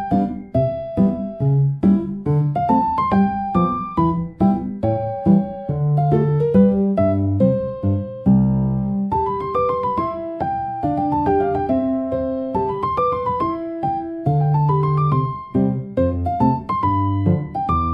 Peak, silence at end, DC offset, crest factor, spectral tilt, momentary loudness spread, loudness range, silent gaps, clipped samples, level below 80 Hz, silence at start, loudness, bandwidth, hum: -4 dBFS; 0 s; under 0.1%; 16 dB; -11.5 dB/octave; 6 LU; 3 LU; none; under 0.1%; -42 dBFS; 0 s; -19 LUFS; 5.2 kHz; none